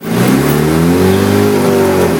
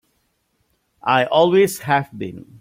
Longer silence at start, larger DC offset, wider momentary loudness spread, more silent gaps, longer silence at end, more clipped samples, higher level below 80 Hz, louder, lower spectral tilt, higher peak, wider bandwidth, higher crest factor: second, 0 s vs 1.05 s; neither; second, 1 LU vs 16 LU; neither; second, 0 s vs 0.2 s; neither; first, -34 dBFS vs -60 dBFS; first, -10 LUFS vs -17 LUFS; about the same, -6 dB/octave vs -5 dB/octave; about the same, 0 dBFS vs -2 dBFS; about the same, 18 kHz vs 16.5 kHz; second, 10 dB vs 18 dB